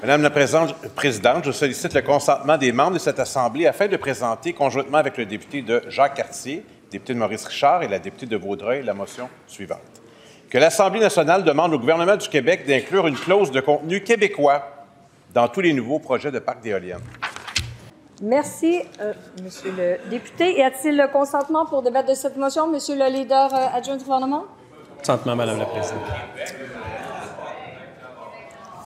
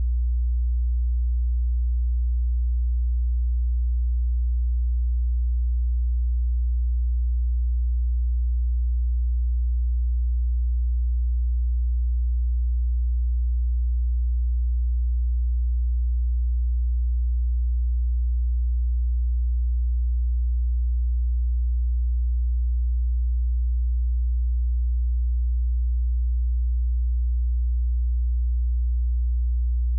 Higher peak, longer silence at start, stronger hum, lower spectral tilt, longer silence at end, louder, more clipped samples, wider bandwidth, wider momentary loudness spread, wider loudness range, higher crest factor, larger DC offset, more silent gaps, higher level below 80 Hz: first, -2 dBFS vs -20 dBFS; about the same, 0 s vs 0 s; neither; second, -4.5 dB/octave vs -27 dB/octave; about the same, 0.1 s vs 0 s; first, -21 LUFS vs -26 LUFS; neither; first, 16 kHz vs 0.1 kHz; first, 16 LU vs 0 LU; first, 7 LU vs 0 LU; first, 20 dB vs 4 dB; neither; neither; second, -56 dBFS vs -22 dBFS